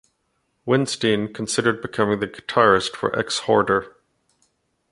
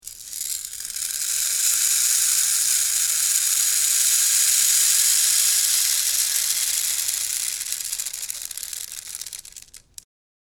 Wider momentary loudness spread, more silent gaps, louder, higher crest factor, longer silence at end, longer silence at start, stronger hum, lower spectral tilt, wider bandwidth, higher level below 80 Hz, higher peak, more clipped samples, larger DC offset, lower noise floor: second, 7 LU vs 14 LU; neither; second, -21 LUFS vs -18 LUFS; about the same, 20 dB vs 20 dB; first, 1.05 s vs 0.7 s; first, 0.65 s vs 0.05 s; neither; first, -4.5 dB/octave vs 4.5 dB/octave; second, 11.5 kHz vs over 20 kHz; about the same, -56 dBFS vs -60 dBFS; about the same, -2 dBFS vs -2 dBFS; neither; neither; first, -71 dBFS vs -45 dBFS